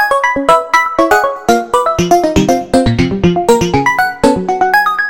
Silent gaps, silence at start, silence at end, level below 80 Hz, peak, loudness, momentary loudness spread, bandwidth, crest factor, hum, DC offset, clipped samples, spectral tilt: none; 0 s; 0 s; -32 dBFS; 0 dBFS; -11 LUFS; 3 LU; 17 kHz; 12 dB; none; 1%; 0.2%; -5 dB/octave